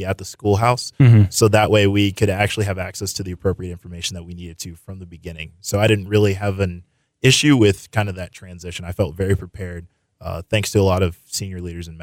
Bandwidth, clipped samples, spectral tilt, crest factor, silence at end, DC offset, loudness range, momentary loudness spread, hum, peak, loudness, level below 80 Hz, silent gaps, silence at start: 16.5 kHz; under 0.1%; -5.5 dB/octave; 16 dB; 0 s; under 0.1%; 8 LU; 19 LU; none; -4 dBFS; -18 LUFS; -44 dBFS; none; 0 s